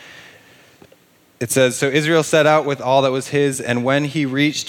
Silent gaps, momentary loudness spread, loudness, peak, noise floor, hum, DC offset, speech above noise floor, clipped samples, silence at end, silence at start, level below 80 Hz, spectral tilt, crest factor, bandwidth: none; 6 LU; -17 LUFS; -2 dBFS; -53 dBFS; none; under 0.1%; 36 dB; under 0.1%; 0 s; 0 s; -66 dBFS; -4.5 dB/octave; 18 dB; 18 kHz